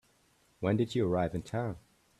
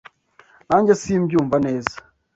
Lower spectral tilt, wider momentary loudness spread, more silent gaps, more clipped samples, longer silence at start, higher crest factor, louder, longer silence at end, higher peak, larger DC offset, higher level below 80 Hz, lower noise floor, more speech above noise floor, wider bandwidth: about the same, -7.5 dB/octave vs -6.5 dB/octave; second, 8 LU vs 11 LU; neither; neither; about the same, 0.6 s vs 0.7 s; about the same, 18 dB vs 20 dB; second, -33 LUFS vs -19 LUFS; about the same, 0.4 s vs 0.4 s; second, -16 dBFS vs 0 dBFS; neither; second, -60 dBFS vs -52 dBFS; first, -69 dBFS vs -54 dBFS; about the same, 37 dB vs 35 dB; first, 13 kHz vs 8 kHz